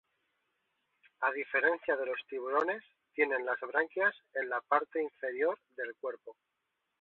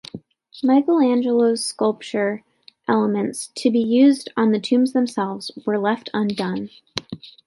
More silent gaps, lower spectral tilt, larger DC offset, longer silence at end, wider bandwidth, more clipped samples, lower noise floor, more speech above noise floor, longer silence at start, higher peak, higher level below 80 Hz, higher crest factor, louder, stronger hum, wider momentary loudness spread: neither; second, -0.5 dB/octave vs -5 dB/octave; neither; first, 0.7 s vs 0.15 s; second, 4.2 kHz vs 11.5 kHz; neither; first, -81 dBFS vs -40 dBFS; first, 47 dB vs 20 dB; first, 1.2 s vs 0.15 s; second, -12 dBFS vs -2 dBFS; second, -84 dBFS vs -66 dBFS; about the same, 22 dB vs 18 dB; second, -33 LUFS vs -20 LUFS; neither; about the same, 12 LU vs 14 LU